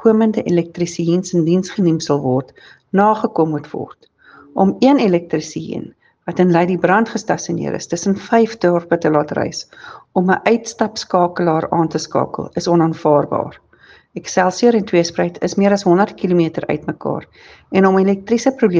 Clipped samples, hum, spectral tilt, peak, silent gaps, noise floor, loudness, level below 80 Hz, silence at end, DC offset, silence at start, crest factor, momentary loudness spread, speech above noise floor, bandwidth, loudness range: under 0.1%; none; -6 dB/octave; 0 dBFS; none; -48 dBFS; -16 LUFS; -58 dBFS; 0 s; under 0.1%; 0 s; 16 dB; 11 LU; 32 dB; 9.4 kHz; 2 LU